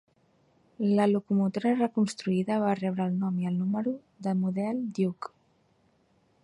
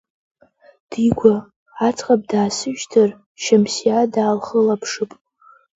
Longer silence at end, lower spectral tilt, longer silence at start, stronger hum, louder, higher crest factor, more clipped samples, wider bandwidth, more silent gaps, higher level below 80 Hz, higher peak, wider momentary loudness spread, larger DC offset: first, 1.15 s vs 0.7 s; first, -7.5 dB/octave vs -5 dB/octave; about the same, 0.8 s vs 0.9 s; neither; second, -28 LUFS vs -18 LUFS; about the same, 16 dB vs 18 dB; neither; first, 11 kHz vs 8 kHz; second, none vs 1.56-1.66 s, 3.26-3.35 s; second, -72 dBFS vs -54 dBFS; second, -14 dBFS vs 0 dBFS; second, 7 LU vs 10 LU; neither